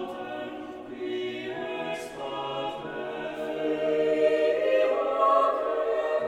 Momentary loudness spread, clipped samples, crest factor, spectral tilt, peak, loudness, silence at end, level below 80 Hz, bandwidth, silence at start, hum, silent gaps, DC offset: 12 LU; under 0.1%; 16 dB; -5 dB/octave; -10 dBFS; -28 LUFS; 0 s; -66 dBFS; 13 kHz; 0 s; none; none; under 0.1%